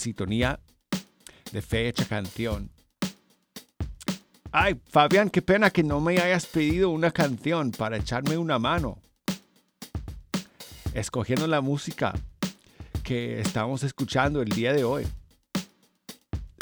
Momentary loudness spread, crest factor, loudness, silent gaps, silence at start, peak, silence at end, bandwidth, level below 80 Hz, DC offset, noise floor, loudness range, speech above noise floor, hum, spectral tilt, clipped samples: 16 LU; 22 dB; -27 LUFS; none; 0 s; -6 dBFS; 0.1 s; over 20 kHz; -44 dBFS; under 0.1%; -50 dBFS; 8 LU; 24 dB; none; -5.5 dB/octave; under 0.1%